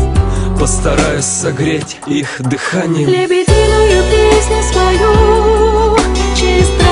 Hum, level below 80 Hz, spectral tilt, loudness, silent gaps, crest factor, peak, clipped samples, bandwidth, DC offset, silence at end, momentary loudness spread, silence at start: none; -16 dBFS; -5 dB/octave; -11 LUFS; none; 10 dB; 0 dBFS; under 0.1%; 11 kHz; under 0.1%; 0 s; 7 LU; 0 s